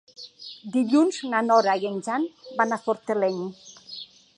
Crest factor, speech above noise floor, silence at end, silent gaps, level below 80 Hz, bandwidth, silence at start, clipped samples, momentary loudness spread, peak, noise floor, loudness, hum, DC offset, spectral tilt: 18 dB; 19 dB; 0.35 s; none; -80 dBFS; 11 kHz; 0.2 s; under 0.1%; 19 LU; -6 dBFS; -43 dBFS; -24 LUFS; none; under 0.1%; -5 dB/octave